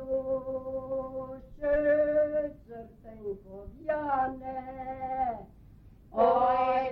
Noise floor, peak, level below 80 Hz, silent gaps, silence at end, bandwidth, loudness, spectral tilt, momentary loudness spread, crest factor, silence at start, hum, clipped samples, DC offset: -53 dBFS; -14 dBFS; -52 dBFS; none; 0 s; 5.4 kHz; -30 LUFS; -8.5 dB/octave; 18 LU; 18 dB; 0 s; none; under 0.1%; under 0.1%